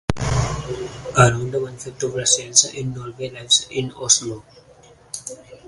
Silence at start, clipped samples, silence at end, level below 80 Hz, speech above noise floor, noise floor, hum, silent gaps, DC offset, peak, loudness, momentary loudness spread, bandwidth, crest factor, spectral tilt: 0.1 s; under 0.1%; 0 s; -40 dBFS; 28 dB; -49 dBFS; none; none; under 0.1%; 0 dBFS; -19 LUFS; 16 LU; 11.5 kHz; 22 dB; -2.5 dB/octave